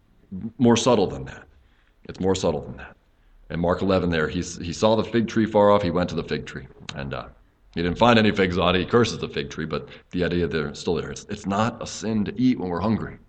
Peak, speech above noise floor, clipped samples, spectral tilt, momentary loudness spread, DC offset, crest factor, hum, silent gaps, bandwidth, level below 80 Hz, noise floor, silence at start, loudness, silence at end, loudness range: -2 dBFS; 34 dB; under 0.1%; -5.5 dB/octave; 17 LU; under 0.1%; 22 dB; none; none; 9 kHz; -46 dBFS; -57 dBFS; 0.3 s; -23 LUFS; 0.1 s; 4 LU